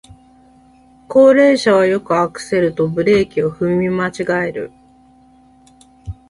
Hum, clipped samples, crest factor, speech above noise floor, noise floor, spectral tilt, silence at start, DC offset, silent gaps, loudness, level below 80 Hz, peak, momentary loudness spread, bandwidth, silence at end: none; under 0.1%; 16 dB; 34 dB; -48 dBFS; -6 dB/octave; 1.1 s; under 0.1%; none; -15 LUFS; -46 dBFS; 0 dBFS; 9 LU; 11.5 kHz; 0.2 s